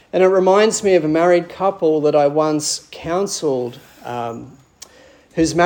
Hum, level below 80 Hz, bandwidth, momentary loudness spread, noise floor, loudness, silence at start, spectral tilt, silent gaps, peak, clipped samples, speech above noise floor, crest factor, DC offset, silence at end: none; -52 dBFS; 18 kHz; 15 LU; -48 dBFS; -17 LUFS; 0.15 s; -4.5 dB/octave; none; -2 dBFS; under 0.1%; 31 dB; 16 dB; under 0.1%; 0 s